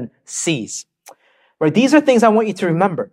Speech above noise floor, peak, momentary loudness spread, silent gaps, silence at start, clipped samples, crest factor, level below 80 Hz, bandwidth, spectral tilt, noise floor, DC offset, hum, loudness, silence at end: 36 dB; 0 dBFS; 14 LU; none; 0 s; under 0.1%; 16 dB; -66 dBFS; 14.5 kHz; -5 dB/octave; -52 dBFS; under 0.1%; none; -16 LUFS; 0.05 s